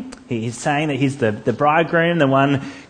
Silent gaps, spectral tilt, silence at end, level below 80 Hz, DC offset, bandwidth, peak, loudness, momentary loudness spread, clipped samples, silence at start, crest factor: none; -6 dB/octave; 0.05 s; -56 dBFS; under 0.1%; 9.8 kHz; -2 dBFS; -18 LUFS; 9 LU; under 0.1%; 0 s; 16 dB